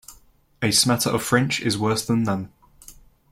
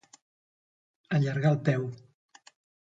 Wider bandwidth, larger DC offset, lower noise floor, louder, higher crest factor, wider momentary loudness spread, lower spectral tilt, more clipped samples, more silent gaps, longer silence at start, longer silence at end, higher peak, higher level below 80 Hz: first, 16.5 kHz vs 7.8 kHz; neither; second, -54 dBFS vs under -90 dBFS; first, -21 LUFS vs -28 LUFS; about the same, 20 dB vs 20 dB; second, 9 LU vs 13 LU; second, -4 dB/octave vs -8 dB/octave; neither; neither; second, 0.1 s vs 1.1 s; second, 0.4 s vs 0.9 s; first, -4 dBFS vs -12 dBFS; first, -54 dBFS vs -70 dBFS